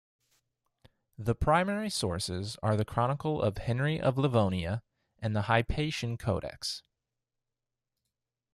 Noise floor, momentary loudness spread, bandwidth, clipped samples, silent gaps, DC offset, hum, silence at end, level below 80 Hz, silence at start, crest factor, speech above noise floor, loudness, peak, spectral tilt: -88 dBFS; 9 LU; 13.5 kHz; under 0.1%; none; under 0.1%; none; 1.75 s; -50 dBFS; 1.2 s; 22 dB; 58 dB; -31 LUFS; -10 dBFS; -5.5 dB/octave